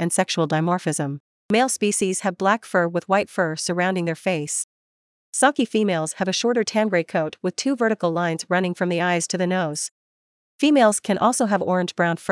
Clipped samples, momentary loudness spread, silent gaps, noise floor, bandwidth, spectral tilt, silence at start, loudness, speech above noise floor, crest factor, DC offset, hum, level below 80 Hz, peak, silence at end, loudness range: under 0.1%; 6 LU; 1.20-1.49 s, 4.64-5.33 s, 9.91-10.59 s; under -90 dBFS; 12 kHz; -4 dB/octave; 0 s; -22 LUFS; over 69 dB; 18 dB; under 0.1%; none; -72 dBFS; -4 dBFS; 0 s; 2 LU